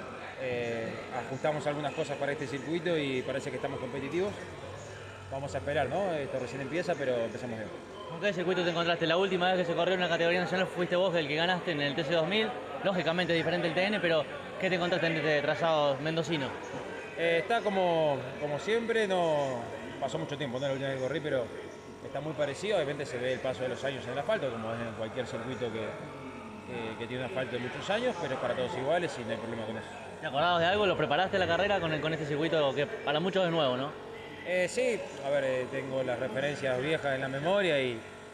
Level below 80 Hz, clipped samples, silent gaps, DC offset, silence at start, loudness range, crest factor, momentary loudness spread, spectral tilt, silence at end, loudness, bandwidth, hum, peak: -66 dBFS; under 0.1%; none; under 0.1%; 0 s; 6 LU; 16 dB; 11 LU; -5 dB/octave; 0 s; -31 LUFS; 12 kHz; none; -14 dBFS